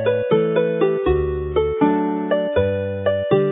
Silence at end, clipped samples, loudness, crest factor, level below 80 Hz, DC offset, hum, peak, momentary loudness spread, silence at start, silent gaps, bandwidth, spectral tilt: 0 s; under 0.1%; -19 LUFS; 16 dB; -34 dBFS; under 0.1%; none; -2 dBFS; 3 LU; 0 s; none; 3.9 kHz; -12 dB/octave